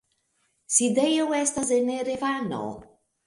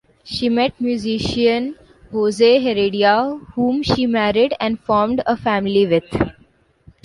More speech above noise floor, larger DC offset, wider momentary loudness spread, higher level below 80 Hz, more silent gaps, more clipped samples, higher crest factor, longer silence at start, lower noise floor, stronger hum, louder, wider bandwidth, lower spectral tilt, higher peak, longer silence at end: first, 47 dB vs 38 dB; neither; first, 11 LU vs 8 LU; second, -64 dBFS vs -44 dBFS; neither; neither; about the same, 20 dB vs 16 dB; first, 0.7 s vs 0.25 s; first, -71 dBFS vs -55 dBFS; neither; second, -24 LUFS vs -18 LUFS; about the same, 11.5 kHz vs 11.5 kHz; second, -3 dB/octave vs -6 dB/octave; second, -6 dBFS vs -2 dBFS; second, 0.45 s vs 0.75 s